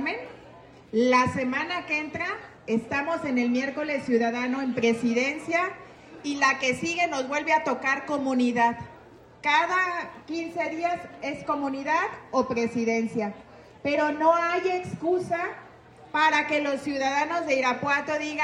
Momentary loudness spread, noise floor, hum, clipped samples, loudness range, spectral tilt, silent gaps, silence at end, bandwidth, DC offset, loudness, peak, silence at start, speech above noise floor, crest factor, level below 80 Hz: 11 LU; -50 dBFS; none; under 0.1%; 3 LU; -4.5 dB/octave; none; 0 s; 11 kHz; under 0.1%; -26 LUFS; -10 dBFS; 0 s; 24 dB; 18 dB; -64 dBFS